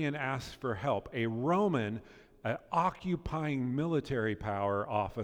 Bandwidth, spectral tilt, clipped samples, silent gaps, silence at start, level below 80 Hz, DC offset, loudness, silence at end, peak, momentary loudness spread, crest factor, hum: 17 kHz; -7.5 dB/octave; under 0.1%; none; 0 s; -56 dBFS; under 0.1%; -34 LUFS; 0 s; -16 dBFS; 8 LU; 16 dB; none